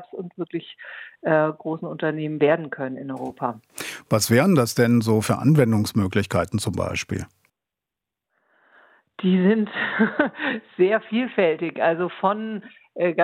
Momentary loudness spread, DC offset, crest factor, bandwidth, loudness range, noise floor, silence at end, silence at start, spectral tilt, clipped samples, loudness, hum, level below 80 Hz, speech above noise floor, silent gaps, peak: 14 LU; under 0.1%; 20 dB; 16.5 kHz; 6 LU; -86 dBFS; 0 s; 0 s; -6 dB/octave; under 0.1%; -22 LUFS; none; -62 dBFS; 65 dB; none; -4 dBFS